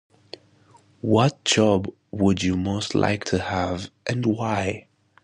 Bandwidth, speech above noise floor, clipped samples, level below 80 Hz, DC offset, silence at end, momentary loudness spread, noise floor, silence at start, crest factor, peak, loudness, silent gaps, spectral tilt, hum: 10.5 kHz; 33 dB; under 0.1%; -46 dBFS; under 0.1%; 0.45 s; 16 LU; -56 dBFS; 1.05 s; 18 dB; -6 dBFS; -23 LUFS; none; -5 dB/octave; none